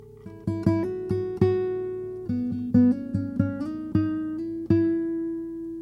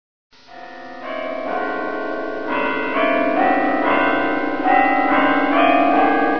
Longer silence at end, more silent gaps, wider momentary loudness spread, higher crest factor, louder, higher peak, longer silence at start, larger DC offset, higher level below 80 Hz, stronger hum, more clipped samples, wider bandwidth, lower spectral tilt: about the same, 0 s vs 0 s; neither; about the same, 10 LU vs 12 LU; about the same, 18 dB vs 16 dB; second, -26 LUFS vs -18 LUFS; second, -8 dBFS vs -2 dBFS; second, 0 s vs 0.3 s; second, under 0.1% vs 3%; first, -52 dBFS vs -58 dBFS; neither; neither; first, 6 kHz vs 5.4 kHz; first, -10 dB/octave vs -6.5 dB/octave